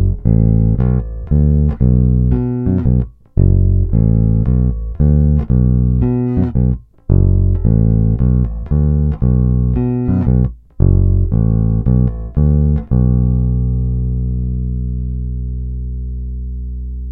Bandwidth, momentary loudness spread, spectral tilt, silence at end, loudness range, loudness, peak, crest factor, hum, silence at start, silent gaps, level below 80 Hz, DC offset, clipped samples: 2.6 kHz; 10 LU; -14.5 dB/octave; 0 s; 4 LU; -15 LUFS; 0 dBFS; 12 dB; none; 0 s; none; -18 dBFS; under 0.1%; under 0.1%